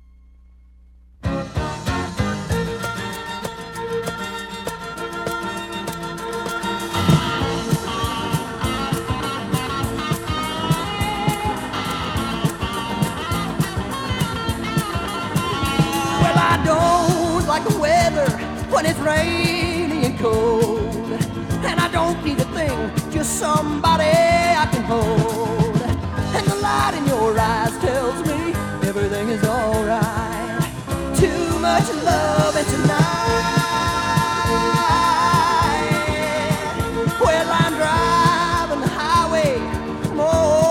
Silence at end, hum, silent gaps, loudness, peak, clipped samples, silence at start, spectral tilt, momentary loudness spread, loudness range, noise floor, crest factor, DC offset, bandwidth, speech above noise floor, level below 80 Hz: 0 s; none; none; -20 LUFS; -2 dBFS; under 0.1%; 1.2 s; -5 dB/octave; 9 LU; 8 LU; -48 dBFS; 18 dB; under 0.1%; 19.5 kHz; 30 dB; -36 dBFS